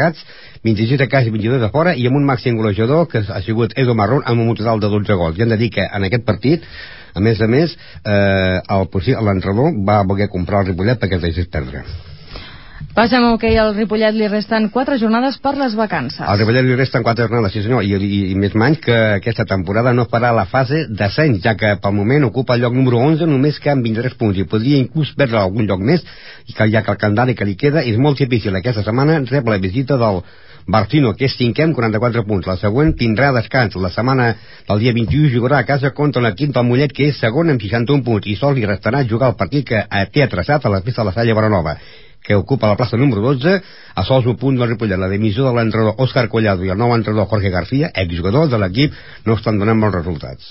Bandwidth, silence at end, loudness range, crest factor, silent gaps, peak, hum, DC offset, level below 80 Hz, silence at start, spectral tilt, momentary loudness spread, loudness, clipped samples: 5.8 kHz; 0 s; 2 LU; 14 dB; none; 0 dBFS; none; 0.8%; -36 dBFS; 0 s; -11.5 dB/octave; 5 LU; -16 LUFS; under 0.1%